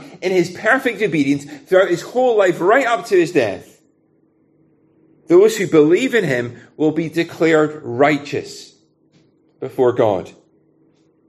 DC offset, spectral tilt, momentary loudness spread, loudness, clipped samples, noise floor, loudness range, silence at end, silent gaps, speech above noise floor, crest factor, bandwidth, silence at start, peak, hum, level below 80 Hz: under 0.1%; -5.5 dB/octave; 11 LU; -16 LUFS; under 0.1%; -59 dBFS; 4 LU; 1 s; none; 43 dB; 16 dB; 13 kHz; 0 s; 0 dBFS; none; -64 dBFS